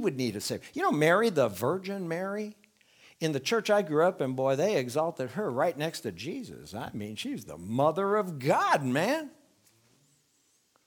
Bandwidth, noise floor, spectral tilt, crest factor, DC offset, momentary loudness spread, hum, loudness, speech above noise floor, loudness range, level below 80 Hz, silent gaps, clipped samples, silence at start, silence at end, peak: 19.5 kHz; -70 dBFS; -5 dB/octave; 18 dB; under 0.1%; 13 LU; none; -29 LUFS; 41 dB; 3 LU; -72 dBFS; none; under 0.1%; 0 s; 1.55 s; -12 dBFS